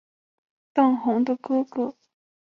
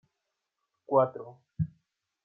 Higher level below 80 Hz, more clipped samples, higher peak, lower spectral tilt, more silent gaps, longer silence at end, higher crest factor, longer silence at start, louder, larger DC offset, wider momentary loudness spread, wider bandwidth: second, -74 dBFS vs -62 dBFS; neither; first, -8 dBFS vs -12 dBFS; second, -7.5 dB/octave vs -11.5 dB/octave; neither; about the same, 0.65 s vs 0.6 s; about the same, 18 dB vs 22 dB; second, 0.75 s vs 0.9 s; first, -24 LUFS vs -30 LUFS; neither; second, 9 LU vs 19 LU; first, 6 kHz vs 3.4 kHz